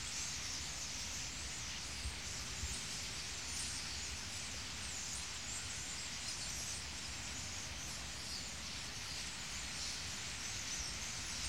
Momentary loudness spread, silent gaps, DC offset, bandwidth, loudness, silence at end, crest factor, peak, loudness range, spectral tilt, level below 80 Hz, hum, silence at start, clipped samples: 3 LU; none; 0.2%; 16.5 kHz; -42 LUFS; 0 s; 16 dB; -28 dBFS; 1 LU; -1 dB/octave; -56 dBFS; none; 0 s; under 0.1%